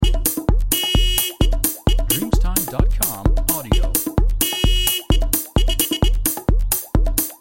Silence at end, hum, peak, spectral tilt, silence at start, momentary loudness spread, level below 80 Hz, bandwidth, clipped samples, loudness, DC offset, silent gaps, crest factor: 0.05 s; none; -2 dBFS; -3.5 dB/octave; 0 s; 3 LU; -20 dBFS; 17 kHz; under 0.1%; -19 LUFS; under 0.1%; none; 14 dB